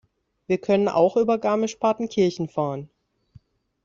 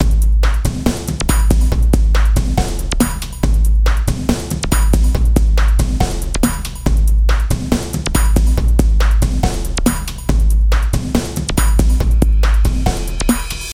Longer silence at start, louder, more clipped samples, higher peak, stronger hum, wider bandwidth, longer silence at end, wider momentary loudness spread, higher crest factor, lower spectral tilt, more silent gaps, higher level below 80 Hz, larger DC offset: first, 0.5 s vs 0 s; second, -23 LUFS vs -16 LUFS; neither; second, -6 dBFS vs 0 dBFS; neither; second, 7.6 kHz vs 15.5 kHz; first, 1 s vs 0 s; first, 8 LU vs 5 LU; first, 18 dB vs 12 dB; about the same, -6.5 dB/octave vs -5.5 dB/octave; neither; second, -64 dBFS vs -14 dBFS; neither